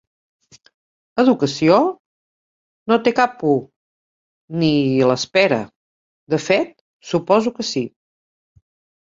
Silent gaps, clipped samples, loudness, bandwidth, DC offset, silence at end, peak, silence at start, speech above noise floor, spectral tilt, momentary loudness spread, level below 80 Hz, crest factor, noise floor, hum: 1.99-2.86 s, 3.76-4.48 s, 5.76-6.27 s, 6.81-7.00 s; under 0.1%; -18 LUFS; 7.8 kHz; under 0.1%; 1.15 s; 0 dBFS; 1.15 s; over 73 dB; -5.5 dB/octave; 13 LU; -60 dBFS; 20 dB; under -90 dBFS; none